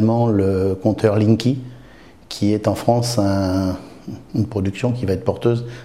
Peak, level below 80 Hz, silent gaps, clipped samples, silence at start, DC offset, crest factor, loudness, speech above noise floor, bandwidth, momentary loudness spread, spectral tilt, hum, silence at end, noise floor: -2 dBFS; -48 dBFS; none; under 0.1%; 0 s; 0.3%; 18 dB; -19 LUFS; 26 dB; 15 kHz; 11 LU; -7 dB/octave; none; 0 s; -44 dBFS